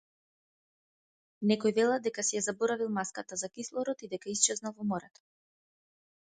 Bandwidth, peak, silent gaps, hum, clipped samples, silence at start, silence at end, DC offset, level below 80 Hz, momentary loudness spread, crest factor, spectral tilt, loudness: 9.6 kHz; -8 dBFS; none; none; under 0.1%; 1.4 s; 1.25 s; under 0.1%; -78 dBFS; 9 LU; 26 dB; -3 dB/octave; -32 LUFS